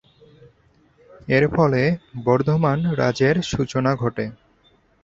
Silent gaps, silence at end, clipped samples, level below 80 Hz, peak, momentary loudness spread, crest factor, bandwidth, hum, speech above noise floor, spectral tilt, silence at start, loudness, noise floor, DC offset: none; 0.7 s; under 0.1%; -48 dBFS; -2 dBFS; 7 LU; 18 dB; 7.8 kHz; none; 39 dB; -7 dB/octave; 1.25 s; -20 LUFS; -59 dBFS; under 0.1%